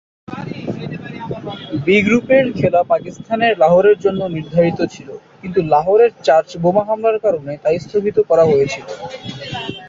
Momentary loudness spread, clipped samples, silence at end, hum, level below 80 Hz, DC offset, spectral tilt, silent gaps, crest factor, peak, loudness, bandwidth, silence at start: 16 LU; under 0.1%; 0 s; none; -50 dBFS; under 0.1%; -6.5 dB/octave; none; 14 dB; -2 dBFS; -15 LUFS; 7.6 kHz; 0.3 s